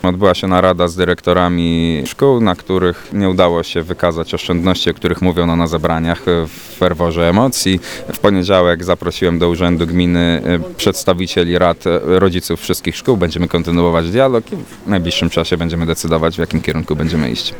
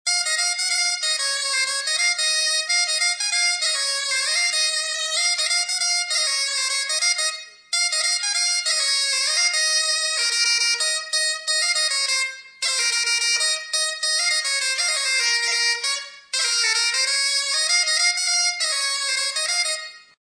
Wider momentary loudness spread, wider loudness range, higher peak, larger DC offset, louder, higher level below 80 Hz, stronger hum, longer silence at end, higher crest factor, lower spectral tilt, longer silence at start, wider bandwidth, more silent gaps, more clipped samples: about the same, 6 LU vs 4 LU; about the same, 2 LU vs 1 LU; first, 0 dBFS vs -6 dBFS; neither; first, -14 LUFS vs -19 LUFS; first, -34 dBFS vs -84 dBFS; neither; second, 0 s vs 0.4 s; about the same, 14 dB vs 16 dB; first, -5.5 dB/octave vs 6.5 dB/octave; about the same, 0.05 s vs 0.05 s; first, over 20 kHz vs 10.5 kHz; neither; neither